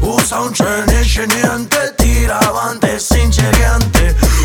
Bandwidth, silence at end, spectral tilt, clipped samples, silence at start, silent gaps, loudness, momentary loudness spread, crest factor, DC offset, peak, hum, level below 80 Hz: over 20 kHz; 0 s; -4.5 dB/octave; under 0.1%; 0 s; none; -13 LUFS; 3 LU; 12 dB; under 0.1%; 0 dBFS; none; -16 dBFS